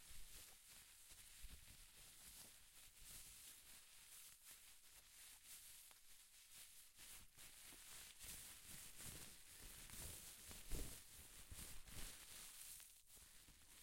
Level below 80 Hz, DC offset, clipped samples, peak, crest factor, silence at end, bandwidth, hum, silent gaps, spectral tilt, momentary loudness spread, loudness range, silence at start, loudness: -66 dBFS; under 0.1%; under 0.1%; -34 dBFS; 26 dB; 0 s; 16.5 kHz; none; none; -1.5 dB/octave; 9 LU; 5 LU; 0 s; -59 LUFS